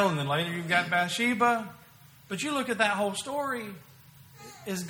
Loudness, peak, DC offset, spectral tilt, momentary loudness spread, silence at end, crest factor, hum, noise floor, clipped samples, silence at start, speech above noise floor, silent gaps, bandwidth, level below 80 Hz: -28 LUFS; -8 dBFS; under 0.1%; -4 dB/octave; 18 LU; 0 s; 22 dB; none; -54 dBFS; under 0.1%; 0 s; 26 dB; none; over 20 kHz; -70 dBFS